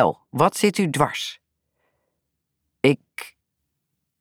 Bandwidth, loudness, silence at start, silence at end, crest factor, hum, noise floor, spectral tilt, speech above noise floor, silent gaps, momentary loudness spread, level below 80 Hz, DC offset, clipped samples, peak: 19 kHz; -22 LUFS; 0 s; 0.95 s; 22 dB; none; -78 dBFS; -5 dB/octave; 57 dB; none; 19 LU; -60 dBFS; under 0.1%; under 0.1%; -4 dBFS